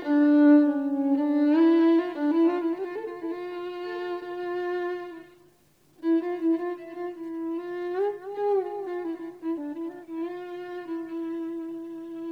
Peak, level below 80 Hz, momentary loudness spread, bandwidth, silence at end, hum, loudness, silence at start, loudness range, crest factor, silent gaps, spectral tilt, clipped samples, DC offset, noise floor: -10 dBFS; -76 dBFS; 16 LU; 5.2 kHz; 0 s; none; -27 LUFS; 0 s; 11 LU; 16 dB; none; -6.5 dB/octave; under 0.1%; under 0.1%; -62 dBFS